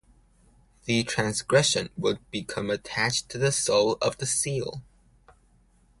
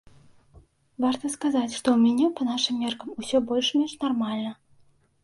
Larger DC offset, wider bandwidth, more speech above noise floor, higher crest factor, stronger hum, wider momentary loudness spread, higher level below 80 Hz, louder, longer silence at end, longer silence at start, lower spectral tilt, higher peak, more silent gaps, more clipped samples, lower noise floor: neither; about the same, 11.5 kHz vs 11.5 kHz; about the same, 35 dB vs 36 dB; about the same, 22 dB vs 20 dB; neither; about the same, 10 LU vs 9 LU; first, -56 dBFS vs -64 dBFS; about the same, -26 LUFS vs -25 LUFS; first, 1.2 s vs 0.7 s; second, 0.85 s vs 1 s; about the same, -3.5 dB/octave vs -4 dB/octave; about the same, -6 dBFS vs -6 dBFS; neither; neither; about the same, -61 dBFS vs -60 dBFS